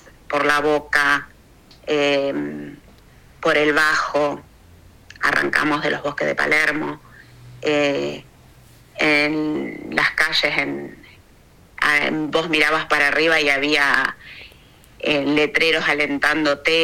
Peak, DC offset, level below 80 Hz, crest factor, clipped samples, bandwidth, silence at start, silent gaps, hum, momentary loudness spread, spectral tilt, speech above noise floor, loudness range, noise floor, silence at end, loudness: 0 dBFS; under 0.1%; -50 dBFS; 20 dB; under 0.1%; 16.5 kHz; 0.3 s; none; none; 13 LU; -3.5 dB/octave; 31 dB; 4 LU; -50 dBFS; 0 s; -18 LUFS